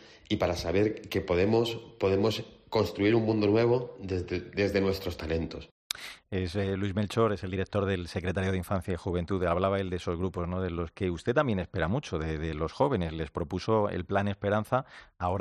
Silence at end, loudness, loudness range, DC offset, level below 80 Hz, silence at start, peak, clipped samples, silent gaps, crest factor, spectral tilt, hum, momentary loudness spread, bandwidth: 0 s; -30 LUFS; 4 LU; under 0.1%; -52 dBFS; 0 s; -6 dBFS; under 0.1%; 5.71-5.90 s; 22 dB; -6.5 dB/octave; none; 8 LU; 13.5 kHz